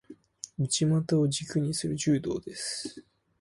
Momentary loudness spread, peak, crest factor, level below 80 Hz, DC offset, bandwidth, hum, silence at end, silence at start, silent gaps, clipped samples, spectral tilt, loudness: 13 LU; -14 dBFS; 16 dB; -62 dBFS; under 0.1%; 11.5 kHz; none; 0.4 s; 0.1 s; none; under 0.1%; -5 dB/octave; -29 LUFS